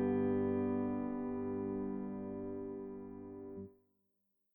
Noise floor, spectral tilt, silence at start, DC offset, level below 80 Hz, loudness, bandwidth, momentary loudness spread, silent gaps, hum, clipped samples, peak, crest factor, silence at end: -82 dBFS; -11.5 dB/octave; 0 s; under 0.1%; -66 dBFS; -39 LUFS; 3.4 kHz; 15 LU; none; none; under 0.1%; -24 dBFS; 14 dB; 0.8 s